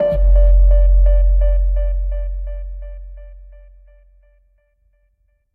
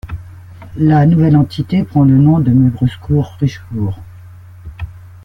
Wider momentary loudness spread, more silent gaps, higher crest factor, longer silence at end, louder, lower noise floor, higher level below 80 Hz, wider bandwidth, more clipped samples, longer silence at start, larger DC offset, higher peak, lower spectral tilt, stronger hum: about the same, 20 LU vs 20 LU; neither; about the same, 12 dB vs 12 dB; first, 2.25 s vs 0.2 s; second, -17 LUFS vs -13 LUFS; first, -62 dBFS vs -35 dBFS; first, -16 dBFS vs -38 dBFS; second, 1.9 kHz vs 6.2 kHz; neither; about the same, 0 s vs 0.05 s; neither; about the same, -4 dBFS vs -2 dBFS; first, -11 dB/octave vs -9.5 dB/octave; neither